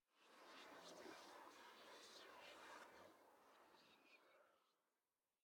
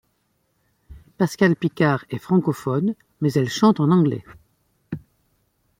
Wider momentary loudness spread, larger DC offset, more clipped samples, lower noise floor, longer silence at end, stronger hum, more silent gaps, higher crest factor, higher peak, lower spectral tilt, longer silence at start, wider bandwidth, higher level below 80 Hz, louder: second, 5 LU vs 17 LU; neither; neither; first, under -90 dBFS vs -69 dBFS; about the same, 0.7 s vs 0.8 s; neither; neither; about the same, 18 dB vs 18 dB; second, -48 dBFS vs -4 dBFS; second, -1.5 dB/octave vs -7 dB/octave; second, 0.1 s vs 0.9 s; first, 19 kHz vs 16 kHz; second, under -90 dBFS vs -56 dBFS; second, -62 LUFS vs -21 LUFS